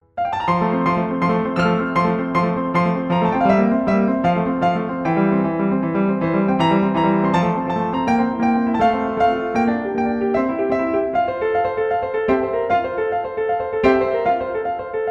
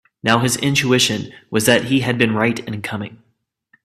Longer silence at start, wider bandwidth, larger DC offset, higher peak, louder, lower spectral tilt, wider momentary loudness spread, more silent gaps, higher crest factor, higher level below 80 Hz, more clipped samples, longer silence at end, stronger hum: about the same, 0.15 s vs 0.25 s; second, 8 kHz vs 15.5 kHz; neither; second, -4 dBFS vs 0 dBFS; about the same, -19 LUFS vs -17 LUFS; first, -8 dB/octave vs -4 dB/octave; second, 5 LU vs 11 LU; neither; about the same, 14 dB vs 18 dB; about the same, -48 dBFS vs -52 dBFS; neither; second, 0 s vs 0.7 s; neither